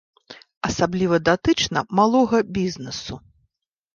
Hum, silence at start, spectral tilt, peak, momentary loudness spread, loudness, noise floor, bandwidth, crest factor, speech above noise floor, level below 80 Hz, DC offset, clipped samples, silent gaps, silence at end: none; 0.3 s; -5 dB/octave; -4 dBFS; 13 LU; -21 LUFS; -72 dBFS; 7.4 kHz; 18 dB; 52 dB; -48 dBFS; under 0.1%; under 0.1%; 0.57-0.61 s; 0.75 s